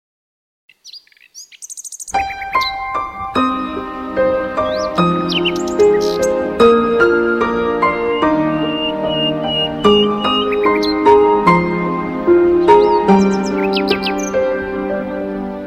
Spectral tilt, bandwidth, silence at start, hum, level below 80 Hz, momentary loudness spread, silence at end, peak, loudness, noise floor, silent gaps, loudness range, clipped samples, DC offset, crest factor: -5 dB/octave; 14.5 kHz; 0.85 s; none; -42 dBFS; 10 LU; 0 s; 0 dBFS; -15 LUFS; -40 dBFS; none; 8 LU; under 0.1%; under 0.1%; 16 dB